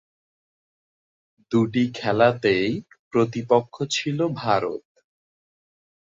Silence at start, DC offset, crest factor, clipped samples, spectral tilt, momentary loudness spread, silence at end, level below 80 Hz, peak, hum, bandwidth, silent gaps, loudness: 1.5 s; under 0.1%; 20 dB; under 0.1%; -5.5 dB/octave; 7 LU; 1.35 s; -62 dBFS; -4 dBFS; none; 7.8 kHz; 2.99-3.11 s; -23 LUFS